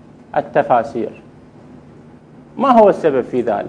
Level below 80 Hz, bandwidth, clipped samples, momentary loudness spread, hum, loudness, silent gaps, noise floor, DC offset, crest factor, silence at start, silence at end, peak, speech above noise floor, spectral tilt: -56 dBFS; 9.8 kHz; under 0.1%; 15 LU; none; -15 LUFS; none; -42 dBFS; under 0.1%; 18 dB; 0.35 s; 0 s; 0 dBFS; 27 dB; -7.5 dB/octave